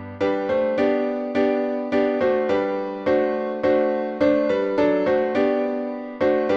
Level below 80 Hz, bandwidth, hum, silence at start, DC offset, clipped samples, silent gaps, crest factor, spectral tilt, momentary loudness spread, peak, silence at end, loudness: -56 dBFS; 7 kHz; none; 0 s; under 0.1%; under 0.1%; none; 14 dB; -7 dB/octave; 4 LU; -8 dBFS; 0 s; -22 LUFS